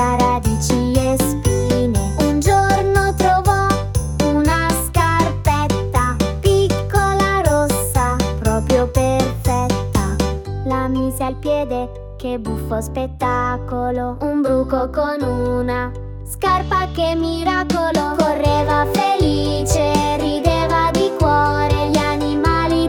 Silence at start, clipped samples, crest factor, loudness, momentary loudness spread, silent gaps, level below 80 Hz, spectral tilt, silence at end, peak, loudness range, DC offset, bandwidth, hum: 0 s; under 0.1%; 16 dB; -18 LUFS; 6 LU; none; -28 dBFS; -5.5 dB/octave; 0 s; -2 dBFS; 5 LU; under 0.1%; 18 kHz; none